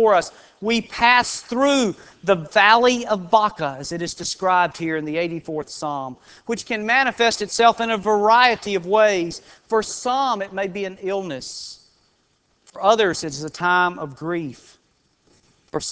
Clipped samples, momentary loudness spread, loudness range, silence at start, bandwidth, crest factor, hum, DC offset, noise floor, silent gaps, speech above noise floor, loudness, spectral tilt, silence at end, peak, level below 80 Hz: under 0.1%; 14 LU; 6 LU; 0 s; 8 kHz; 20 dB; none; under 0.1%; -65 dBFS; none; 44 dB; -20 LUFS; -3.5 dB/octave; 0 s; 0 dBFS; -58 dBFS